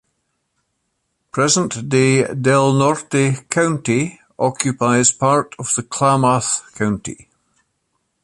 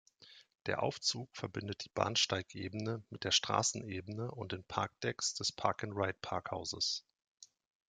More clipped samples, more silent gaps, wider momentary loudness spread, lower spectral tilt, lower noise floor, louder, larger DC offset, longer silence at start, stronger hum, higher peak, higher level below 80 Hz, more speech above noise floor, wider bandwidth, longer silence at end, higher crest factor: neither; second, none vs 7.28-7.35 s; second, 8 LU vs 11 LU; first, -4.5 dB/octave vs -3 dB/octave; first, -71 dBFS vs -62 dBFS; first, -17 LUFS vs -37 LUFS; neither; first, 1.35 s vs 0.2 s; neither; first, 0 dBFS vs -14 dBFS; first, -54 dBFS vs -72 dBFS; first, 54 dB vs 24 dB; about the same, 11.5 kHz vs 11 kHz; first, 1.1 s vs 0.45 s; second, 18 dB vs 24 dB